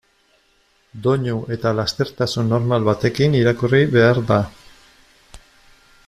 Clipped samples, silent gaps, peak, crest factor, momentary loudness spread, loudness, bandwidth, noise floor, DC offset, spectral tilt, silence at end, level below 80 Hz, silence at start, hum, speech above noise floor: under 0.1%; none; -2 dBFS; 18 dB; 7 LU; -18 LUFS; 13.5 kHz; -60 dBFS; under 0.1%; -6.5 dB/octave; 0.7 s; -50 dBFS; 0.95 s; none; 42 dB